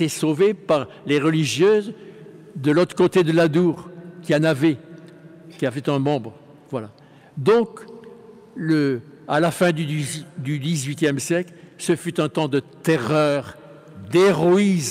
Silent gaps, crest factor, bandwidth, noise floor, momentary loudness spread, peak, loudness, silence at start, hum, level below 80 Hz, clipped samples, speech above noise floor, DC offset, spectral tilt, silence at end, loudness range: none; 14 dB; 15.5 kHz; -44 dBFS; 18 LU; -6 dBFS; -21 LUFS; 0 s; none; -64 dBFS; under 0.1%; 24 dB; under 0.1%; -6 dB/octave; 0 s; 5 LU